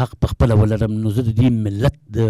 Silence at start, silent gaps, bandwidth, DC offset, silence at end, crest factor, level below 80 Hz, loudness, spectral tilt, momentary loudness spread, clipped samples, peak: 0 s; none; 12.5 kHz; under 0.1%; 0 s; 10 dB; -30 dBFS; -18 LUFS; -8.5 dB/octave; 5 LU; under 0.1%; -8 dBFS